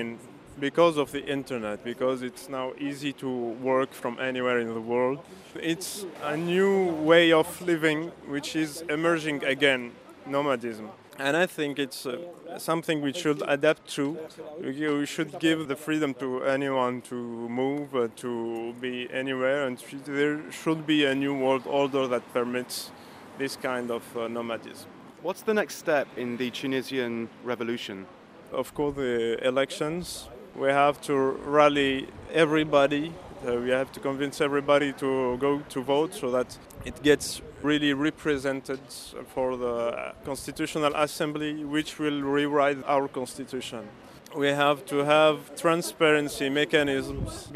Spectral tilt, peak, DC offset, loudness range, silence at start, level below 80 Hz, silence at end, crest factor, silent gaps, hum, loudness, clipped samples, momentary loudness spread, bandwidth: -4.5 dB/octave; -6 dBFS; under 0.1%; 6 LU; 0 s; -58 dBFS; 0 s; 22 dB; none; none; -27 LUFS; under 0.1%; 13 LU; 15.5 kHz